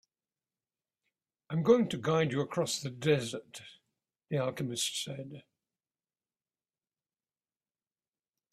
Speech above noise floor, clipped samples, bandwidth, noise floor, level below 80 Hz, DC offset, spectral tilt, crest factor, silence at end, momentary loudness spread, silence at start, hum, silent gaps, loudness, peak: over 59 dB; under 0.1%; 14.5 kHz; under -90 dBFS; -74 dBFS; under 0.1%; -5 dB/octave; 24 dB; 3.15 s; 17 LU; 1.5 s; none; none; -32 LUFS; -12 dBFS